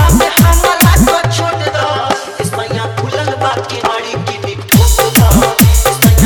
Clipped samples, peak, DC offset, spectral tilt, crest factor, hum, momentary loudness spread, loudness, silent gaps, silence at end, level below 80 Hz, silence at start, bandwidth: under 0.1%; 0 dBFS; under 0.1%; -4.5 dB/octave; 10 dB; none; 9 LU; -11 LUFS; none; 0 s; -16 dBFS; 0 s; over 20 kHz